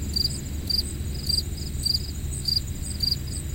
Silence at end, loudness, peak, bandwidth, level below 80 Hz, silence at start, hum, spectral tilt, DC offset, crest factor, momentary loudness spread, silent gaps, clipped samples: 0 s; -26 LUFS; -10 dBFS; 17 kHz; -34 dBFS; 0 s; none; -3 dB/octave; under 0.1%; 16 dB; 7 LU; none; under 0.1%